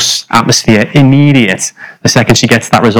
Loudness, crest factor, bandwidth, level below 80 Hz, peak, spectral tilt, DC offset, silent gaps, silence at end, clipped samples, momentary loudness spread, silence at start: -8 LUFS; 8 dB; over 20 kHz; -38 dBFS; 0 dBFS; -4.5 dB/octave; under 0.1%; none; 0 s; 7%; 7 LU; 0 s